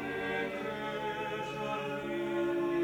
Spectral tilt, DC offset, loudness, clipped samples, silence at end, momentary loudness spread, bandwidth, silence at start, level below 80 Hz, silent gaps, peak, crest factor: -6 dB/octave; under 0.1%; -35 LUFS; under 0.1%; 0 s; 4 LU; 17 kHz; 0 s; -64 dBFS; none; -22 dBFS; 14 dB